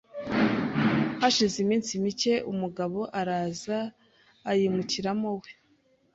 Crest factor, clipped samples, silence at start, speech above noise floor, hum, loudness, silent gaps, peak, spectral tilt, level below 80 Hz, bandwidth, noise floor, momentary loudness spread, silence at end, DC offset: 20 dB; under 0.1%; 0.15 s; 38 dB; none; -27 LUFS; none; -10 dBFS; -4.5 dB/octave; -62 dBFS; 8 kHz; -66 dBFS; 8 LU; 0.6 s; under 0.1%